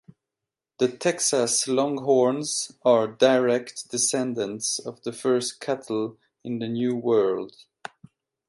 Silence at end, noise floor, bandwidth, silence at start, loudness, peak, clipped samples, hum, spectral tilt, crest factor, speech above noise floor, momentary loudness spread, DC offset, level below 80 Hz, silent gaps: 1 s; -88 dBFS; 11.5 kHz; 0.8 s; -24 LUFS; -4 dBFS; under 0.1%; none; -3.5 dB/octave; 20 dB; 64 dB; 13 LU; under 0.1%; -74 dBFS; none